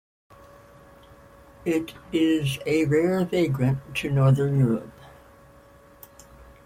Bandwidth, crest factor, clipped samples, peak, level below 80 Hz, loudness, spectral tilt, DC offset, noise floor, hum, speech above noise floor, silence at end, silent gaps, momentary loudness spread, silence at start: 15.5 kHz; 16 dB; under 0.1%; -10 dBFS; -54 dBFS; -24 LUFS; -7 dB/octave; under 0.1%; -52 dBFS; none; 29 dB; 0.25 s; none; 8 LU; 1.65 s